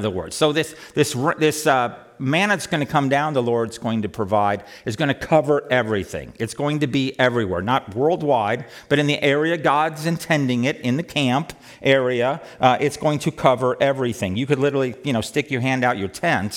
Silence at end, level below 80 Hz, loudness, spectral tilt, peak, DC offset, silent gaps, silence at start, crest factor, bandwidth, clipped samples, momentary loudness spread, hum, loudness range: 0 s; -56 dBFS; -21 LUFS; -5.5 dB/octave; -2 dBFS; under 0.1%; none; 0 s; 18 dB; 17.5 kHz; under 0.1%; 6 LU; none; 2 LU